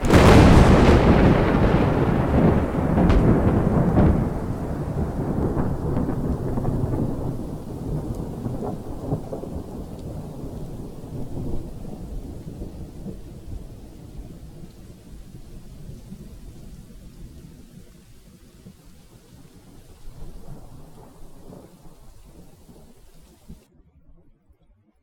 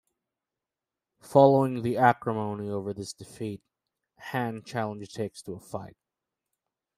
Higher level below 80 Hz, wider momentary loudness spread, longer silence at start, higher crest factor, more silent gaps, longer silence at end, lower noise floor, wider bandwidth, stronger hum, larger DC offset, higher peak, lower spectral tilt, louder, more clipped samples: first, -30 dBFS vs -70 dBFS; first, 28 LU vs 19 LU; second, 0 s vs 1.25 s; about the same, 22 dB vs 24 dB; neither; first, 1.5 s vs 1.05 s; second, -59 dBFS vs -89 dBFS; first, 16.5 kHz vs 14.5 kHz; neither; neither; first, 0 dBFS vs -4 dBFS; about the same, -7.5 dB/octave vs -7 dB/octave; first, -20 LUFS vs -27 LUFS; neither